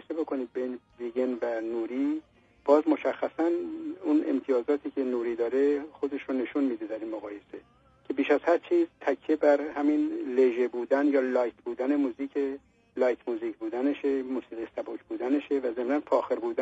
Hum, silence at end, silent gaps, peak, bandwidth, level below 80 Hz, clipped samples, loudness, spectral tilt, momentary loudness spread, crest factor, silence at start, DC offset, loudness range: none; 0 s; none; -8 dBFS; 7.8 kHz; -72 dBFS; under 0.1%; -29 LUFS; -6 dB/octave; 12 LU; 20 dB; 0.1 s; under 0.1%; 4 LU